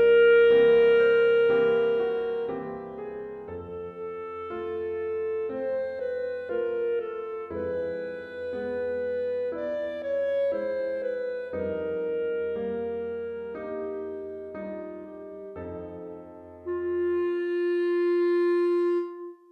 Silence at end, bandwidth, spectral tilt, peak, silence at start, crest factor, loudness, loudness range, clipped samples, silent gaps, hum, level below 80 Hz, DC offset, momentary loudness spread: 0.15 s; 4.5 kHz; -7.5 dB/octave; -12 dBFS; 0 s; 14 dB; -27 LUFS; 9 LU; under 0.1%; none; none; -62 dBFS; under 0.1%; 17 LU